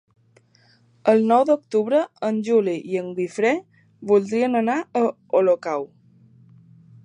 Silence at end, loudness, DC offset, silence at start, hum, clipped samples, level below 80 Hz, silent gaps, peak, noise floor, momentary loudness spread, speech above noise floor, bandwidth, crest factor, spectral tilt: 1.2 s; -21 LUFS; under 0.1%; 1.05 s; none; under 0.1%; -76 dBFS; none; -4 dBFS; -58 dBFS; 10 LU; 37 dB; 10 kHz; 18 dB; -6.5 dB/octave